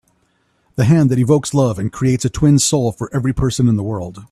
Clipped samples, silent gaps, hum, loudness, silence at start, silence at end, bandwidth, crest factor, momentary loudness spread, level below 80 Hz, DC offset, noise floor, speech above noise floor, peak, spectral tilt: under 0.1%; none; none; -16 LUFS; 0.75 s; 0.05 s; 13.5 kHz; 14 dB; 7 LU; -38 dBFS; under 0.1%; -61 dBFS; 47 dB; 0 dBFS; -6 dB/octave